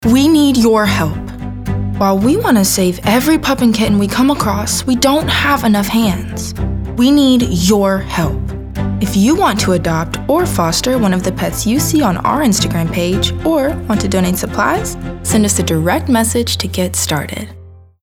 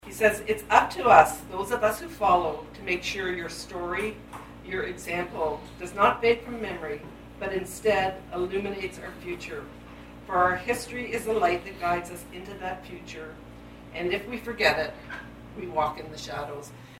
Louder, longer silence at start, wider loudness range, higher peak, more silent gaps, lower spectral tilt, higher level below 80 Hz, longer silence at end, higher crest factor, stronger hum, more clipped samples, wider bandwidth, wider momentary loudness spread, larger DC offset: first, -13 LUFS vs -27 LUFS; about the same, 0 s vs 0.05 s; second, 2 LU vs 8 LU; about the same, 0 dBFS vs 0 dBFS; neither; about the same, -4.5 dB/octave vs -4 dB/octave; first, -30 dBFS vs -50 dBFS; first, 0.25 s vs 0 s; second, 12 dB vs 28 dB; neither; neither; first, over 20 kHz vs 16 kHz; second, 9 LU vs 18 LU; neither